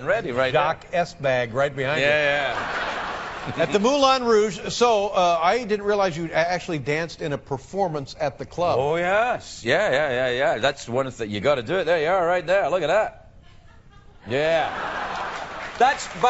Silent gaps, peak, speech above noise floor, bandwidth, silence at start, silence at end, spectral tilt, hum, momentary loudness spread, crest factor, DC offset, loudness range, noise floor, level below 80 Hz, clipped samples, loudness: none; -4 dBFS; 26 dB; 8 kHz; 0 s; 0 s; -2.5 dB/octave; none; 9 LU; 20 dB; under 0.1%; 4 LU; -48 dBFS; -50 dBFS; under 0.1%; -22 LUFS